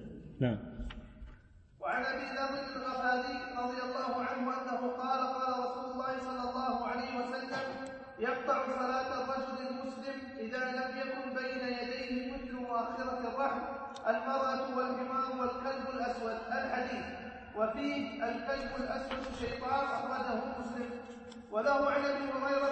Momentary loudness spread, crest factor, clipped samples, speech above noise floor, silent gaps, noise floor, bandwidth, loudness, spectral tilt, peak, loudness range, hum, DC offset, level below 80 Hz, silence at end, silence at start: 8 LU; 18 dB; under 0.1%; 23 dB; none; -58 dBFS; 8.4 kHz; -36 LUFS; -5.5 dB/octave; -18 dBFS; 2 LU; none; under 0.1%; -58 dBFS; 0 s; 0 s